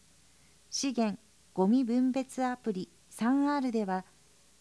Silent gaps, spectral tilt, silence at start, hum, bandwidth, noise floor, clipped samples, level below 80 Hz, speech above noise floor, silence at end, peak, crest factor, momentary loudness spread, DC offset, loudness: none; -5 dB/octave; 0.7 s; none; 11 kHz; -63 dBFS; under 0.1%; -72 dBFS; 33 dB; 0.6 s; -16 dBFS; 16 dB; 11 LU; under 0.1%; -31 LUFS